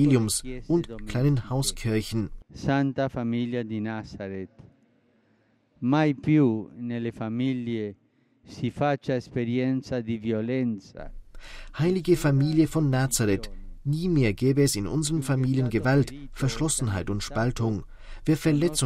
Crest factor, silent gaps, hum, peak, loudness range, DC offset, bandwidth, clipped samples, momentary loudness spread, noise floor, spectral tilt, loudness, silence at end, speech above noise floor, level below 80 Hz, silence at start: 18 dB; none; none; -8 dBFS; 5 LU; under 0.1%; 16 kHz; under 0.1%; 13 LU; -65 dBFS; -6 dB/octave; -26 LUFS; 0 s; 40 dB; -44 dBFS; 0 s